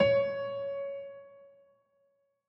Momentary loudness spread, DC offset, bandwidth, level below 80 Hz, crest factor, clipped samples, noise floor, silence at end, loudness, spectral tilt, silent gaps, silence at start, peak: 22 LU; under 0.1%; 5.6 kHz; -66 dBFS; 20 dB; under 0.1%; -74 dBFS; 1 s; -33 LUFS; -7 dB/octave; none; 0 s; -12 dBFS